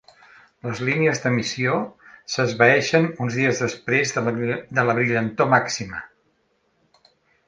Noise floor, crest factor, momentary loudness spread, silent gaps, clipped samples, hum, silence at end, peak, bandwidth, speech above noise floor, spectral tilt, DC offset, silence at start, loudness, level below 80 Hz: -67 dBFS; 22 dB; 13 LU; none; under 0.1%; none; 1.4 s; -2 dBFS; 9.8 kHz; 46 dB; -5 dB/octave; under 0.1%; 0.65 s; -21 LUFS; -60 dBFS